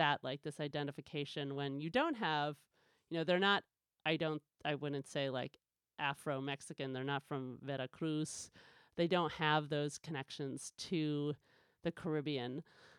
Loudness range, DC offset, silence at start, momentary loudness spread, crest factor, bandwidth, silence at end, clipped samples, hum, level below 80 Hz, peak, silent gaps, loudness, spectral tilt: 4 LU; under 0.1%; 0 s; 10 LU; 22 dB; 13.5 kHz; 0.1 s; under 0.1%; none; -78 dBFS; -18 dBFS; none; -39 LUFS; -5 dB/octave